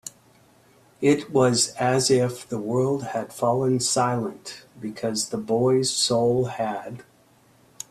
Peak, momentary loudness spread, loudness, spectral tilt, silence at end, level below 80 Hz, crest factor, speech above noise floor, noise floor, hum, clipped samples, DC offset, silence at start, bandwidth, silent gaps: -6 dBFS; 16 LU; -23 LUFS; -4.5 dB/octave; 0.95 s; -62 dBFS; 18 dB; 35 dB; -58 dBFS; none; under 0.1%; under 0.1%; 0.05 s; 14 kHz; none